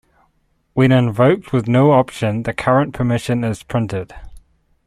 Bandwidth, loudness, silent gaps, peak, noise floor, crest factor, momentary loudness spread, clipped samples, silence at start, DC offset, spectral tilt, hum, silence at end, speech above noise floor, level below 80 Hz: 12 kHz; -17 LUFS; none; -2 dBFS; -62 dBFS; 16 dB; 9 LU; under 0.1%; 0.75 s; under 0.1%; -7.5 dB/octave; none; 0.45 s; 47 dB; -44 dBFS